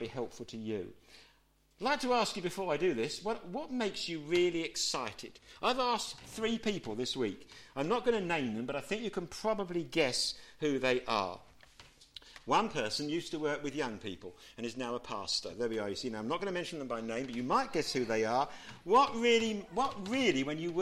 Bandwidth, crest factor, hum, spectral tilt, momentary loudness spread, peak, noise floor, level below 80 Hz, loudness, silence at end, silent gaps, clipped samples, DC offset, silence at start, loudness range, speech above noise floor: 15 kHz; 18 dB; none; -3.5 dB/octave; 12 LU; -16 dBFS; -69 dBFS; -62 dBFS; -34 LUFS; 0 s; none; under 0.1%; under 0.1%; 0 s; 5 LU; 34 dB